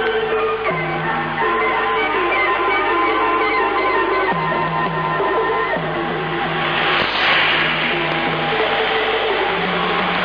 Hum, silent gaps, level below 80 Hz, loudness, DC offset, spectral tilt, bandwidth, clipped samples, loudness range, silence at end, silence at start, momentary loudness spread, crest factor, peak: none; none; -46 dBFS; -17 LUFS; under 0.1%; -6.5 dB/octave; 5.4 kHz; under 0.1%; 2 LU; 0 s; 0 s; 5 LU; 12 dB; -6 dBFS